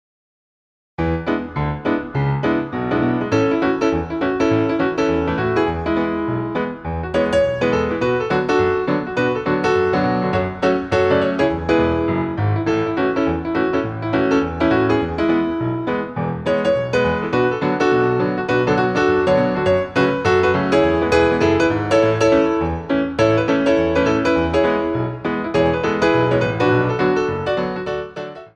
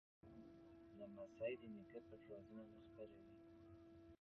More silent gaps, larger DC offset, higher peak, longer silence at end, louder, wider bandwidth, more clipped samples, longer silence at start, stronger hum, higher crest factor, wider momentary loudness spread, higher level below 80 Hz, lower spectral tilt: neither; neither; first, -2 dBFS vs -36 dBFS; about the same, 0.1 s vs 0.05 s; first, -18 LUFS vs -58 LUFS; first, 9.6 kHz vs 6 kHz; neither; first, 1 s vs 0.25 s; neither; second, 16 dB vs 22 dB; second, 6 LU vs 15 LU; first, -40 dBFS vs -78 dBFS; about the same, -7 dB/octave vs -6 dB/octave